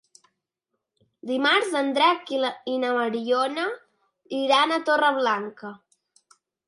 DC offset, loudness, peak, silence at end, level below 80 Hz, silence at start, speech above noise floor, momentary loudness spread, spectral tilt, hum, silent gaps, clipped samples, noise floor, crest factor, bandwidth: under 0.1%; -23 LUFS; -8 dBFS; 0.9 s; -82 dBFS; 1.25 s; 58 dB; 14 LU; -3 dB/octave; none; none; under 0.1%; -81 dBFS; 18 dB; 11.5 kHz